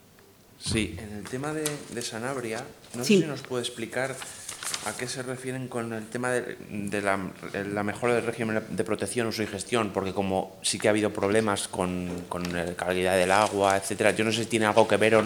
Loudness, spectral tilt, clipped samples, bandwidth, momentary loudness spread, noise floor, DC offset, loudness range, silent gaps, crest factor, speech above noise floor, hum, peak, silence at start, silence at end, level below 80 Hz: -28 LUFS; -4 dB/octave; under 0.1%; over 20 kHz; 11 LU; -55 dBFS; under 0.1%; 6 LU; none; 24 dB; 28 dB; none; -4 dBFS; 0.6 s; 0 s; -58 dBFS